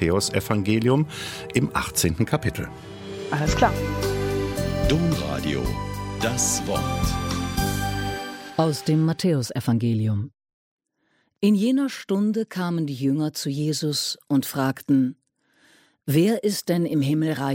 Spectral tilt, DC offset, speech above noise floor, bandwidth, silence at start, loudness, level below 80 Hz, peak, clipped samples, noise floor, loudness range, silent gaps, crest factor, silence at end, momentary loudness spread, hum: -5 dB/octave; under 0.1%; 46 dB; 16.5 kHz; 0 s; -24 LUFS; -38 dBFS; -4 dBFS; under 0.1%; -69 dBFS; 1 LU; 10.54-10.78 s; 20 dB; 0 s; 8 LU; none